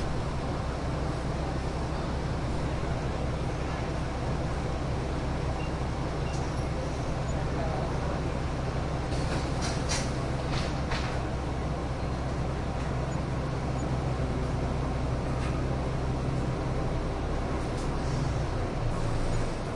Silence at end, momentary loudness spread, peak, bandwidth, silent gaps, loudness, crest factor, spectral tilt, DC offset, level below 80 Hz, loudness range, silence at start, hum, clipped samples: 0 s; 2 LU; -16 dBFS; 11.5 kHz; none; -32 LUFS; 14 dB; -6 dB/octave; under 0.1%; -34 dBFS; 1 LU; 0 s; none; under 0.1%